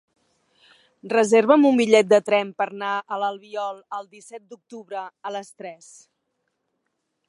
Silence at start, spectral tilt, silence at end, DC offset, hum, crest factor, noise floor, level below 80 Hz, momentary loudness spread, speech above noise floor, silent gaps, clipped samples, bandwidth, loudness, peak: 1.05 s; -4.5 dB/octave; 1.55 s; under 0.1%; none; 22 dB; -76 dBFS; -78 dBFS; 25 LU; 54 dB; none; under 0.1%; 11.5 kHz; -20 LUFS; -2 dBFS